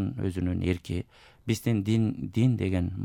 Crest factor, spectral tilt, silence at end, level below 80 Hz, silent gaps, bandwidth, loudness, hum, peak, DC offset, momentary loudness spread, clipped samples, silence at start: 16 dB; -7.5 dB/octave; 0 s; -54 dBFS; none; 16.5 kHz; -28 LUFS; none; -12 dBFS; under 0.1%; 10 LU; under 0.1%; 0 s